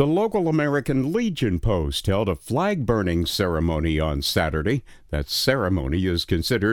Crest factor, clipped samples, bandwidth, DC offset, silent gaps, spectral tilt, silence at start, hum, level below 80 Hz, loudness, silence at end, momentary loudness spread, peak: 18 dB; under 0.1%; 19.5 kHz; under 0.1%; none; -5.5 dB/octave; 0 s; none; -34 dBFS; -23 LUFS; 0 s; 3 LU; -4 dBFS